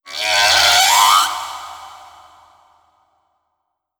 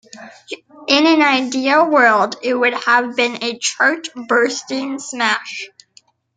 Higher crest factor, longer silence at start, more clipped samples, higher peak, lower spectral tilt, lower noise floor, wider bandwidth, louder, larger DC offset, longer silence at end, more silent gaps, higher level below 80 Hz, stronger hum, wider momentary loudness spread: about the same, 18 dB vs 18 dB; about the same, 0.05 s vs 0.15 s; neither; about the same, 0 dBFS vs 0 dBFS; second, 2 dB/octave vs -2 dB/octave; first, -74 dBFS vs -53 dBFS; first, over 20 kHz vs 9.4 kHz; first, -11 LUFS vs -15 LUFS; neither; first, 2.05 s vs 0.7 s; neither; first, -52 dBFS vs -70 dBFS; neither; first, 20 LU vs 17 LU